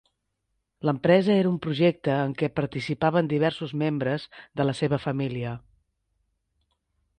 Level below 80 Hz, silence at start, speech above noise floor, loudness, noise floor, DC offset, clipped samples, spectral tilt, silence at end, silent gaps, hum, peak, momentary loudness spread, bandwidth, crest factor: -60 dBFS; 0.85 s; 53 dB; -25 LUFS; -78 dBFS; under 0.1%; under 0.1%; -7.5 dB/octave; 1.6 s; none; none; -6 dBFS; 10 LU; 9.8 kHz; 20 dB